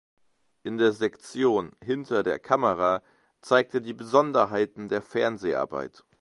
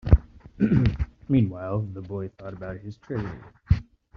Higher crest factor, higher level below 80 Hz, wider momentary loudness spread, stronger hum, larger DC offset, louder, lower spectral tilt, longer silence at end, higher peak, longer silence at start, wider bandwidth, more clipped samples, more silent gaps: about the same, 22 dB vs 22 dB; second, -64 dBFS vs -32 dBFS; second, 9 LU vs 15 LU; neither; neither; about the same, -26 LUFS vs -27 LUFS; second, -5.5 dB/octave vs -9 dB/octave; about the same, 0.35 s vs 0.35 s; about the same, -6 dBFS vs -4 dBFS; first, 0.65 s vs 0.05 s; first, 11.5 kHz vs 6 kHz; neither; neither